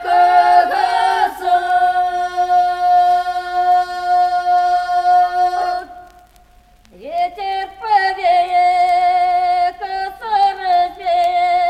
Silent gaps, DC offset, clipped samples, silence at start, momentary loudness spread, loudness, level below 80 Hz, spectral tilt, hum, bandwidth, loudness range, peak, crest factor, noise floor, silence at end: none; under 0.1%; under 0.1%; 0 s; 9 LU; -15 LUFS; -52 dBFS; -2.5 dB/octave; none; 12 kHz; 4 LU; -2 dBFS; 14 dB; -48 dBFS; 0 s